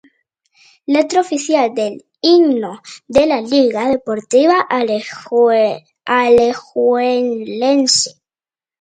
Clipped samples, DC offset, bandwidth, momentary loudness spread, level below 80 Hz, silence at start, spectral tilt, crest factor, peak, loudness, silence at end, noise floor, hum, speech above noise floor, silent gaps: under 0.1%; under 0.1%; 9.6 kHz; 9 LU; -56 dBFS; 0.9 s; -3 dB/octave; 16 dB; 0 dBFS; -15 LUFS; 0.7 s; under -90 dBFS; none; over 76 dB; none